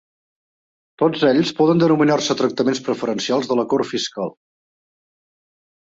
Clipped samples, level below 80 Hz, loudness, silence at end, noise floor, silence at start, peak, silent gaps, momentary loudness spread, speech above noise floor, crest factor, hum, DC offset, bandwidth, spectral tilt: under 0.1%; -62 dBFS; -19 LUFS; 1.65 s; under -90 dBFS; 1 s; -4 dBFS; none; 8 LU; over 72 dB; 16 dB; none; under 0.1%; 8 kHz; -5.5 dB/octave